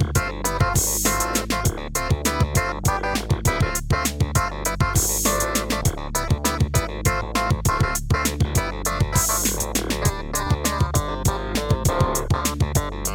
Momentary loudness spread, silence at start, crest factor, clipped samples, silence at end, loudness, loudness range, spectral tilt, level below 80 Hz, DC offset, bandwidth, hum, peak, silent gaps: 4 LU; 0 s; 16 dB; under 0.1%; 0 s; -22 LUFS; 1 LU; -4 dB/octave; -30 dBFS; under 0.1%; 18.5 kHz; none; -6 dBFS; none